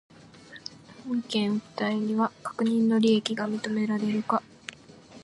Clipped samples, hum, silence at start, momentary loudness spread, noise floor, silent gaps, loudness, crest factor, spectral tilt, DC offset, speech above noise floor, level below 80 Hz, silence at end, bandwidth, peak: under 0.1%; none; 0.5 s; 20 LU; -50 dBFS; none; -27 LUFS; 18 dB; -5.5 dB/octave; under 0.1%; 24 dB; -72 dBFS; 0 s; 11.5 kHz; -10 dBFS